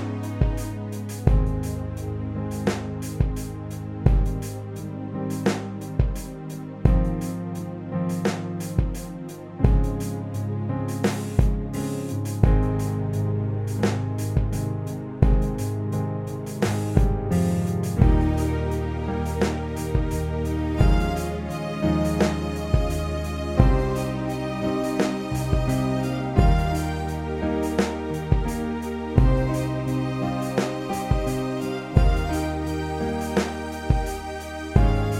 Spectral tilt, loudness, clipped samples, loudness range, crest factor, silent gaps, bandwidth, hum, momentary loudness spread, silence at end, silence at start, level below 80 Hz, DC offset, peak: -7 dB/octave; -25 LUFS; under 0.1%; 3 LU; 20 dB; none; 16 kHz; none; 9 LU; 0 s; 0 s; -28 dBFS; under 0.1%; -4 dBFS